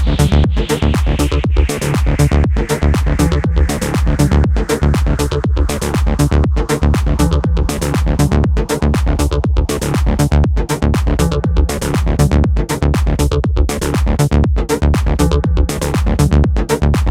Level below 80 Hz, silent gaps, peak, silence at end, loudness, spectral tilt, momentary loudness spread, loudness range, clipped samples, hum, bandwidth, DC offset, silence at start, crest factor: -16 dBFS; none; 0 dBFS; 0 s; -15 LUFS; -6.5 dB/octave; 3 LU; 1 LU; under 0.1%; none; 15.5 kHz; under 0.1%; 0 s; 12 dB